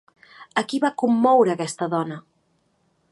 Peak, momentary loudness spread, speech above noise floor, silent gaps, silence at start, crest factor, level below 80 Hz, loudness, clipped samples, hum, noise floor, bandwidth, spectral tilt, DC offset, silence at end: -6 dBFS; 11 LU; 46 dB; none; 0.4 s; 18 dB; -74 dBFS; -21 LUFS; under 0.1%; none; -67 dBFS; 11.5 kHz; -5.5 dB/octave; under 0.1%; 0.9 s